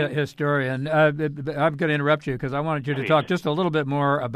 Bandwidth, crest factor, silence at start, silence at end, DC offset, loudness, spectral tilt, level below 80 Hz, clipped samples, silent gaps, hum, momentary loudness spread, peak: 13 kHz; 16 dB; 0 s; 0 s; under 0.1%; -23 LUFS; -7.5 dB/octave; -56 dBFS; under 0.1%; none; none; 6 LU; -6 dBFS